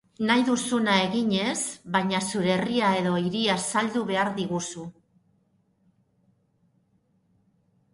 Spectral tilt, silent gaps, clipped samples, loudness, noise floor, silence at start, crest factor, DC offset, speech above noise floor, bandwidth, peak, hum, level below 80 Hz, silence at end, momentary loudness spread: -4 dB/octave; none; under 0.1%; -25 LUFS; -68 dBFS; 0.2 s; 20 dB; under 0.1%; 43 dB; 11.5 kHz; -8 dBFS; none; -66 dBFS; 3.05 s; 7 LU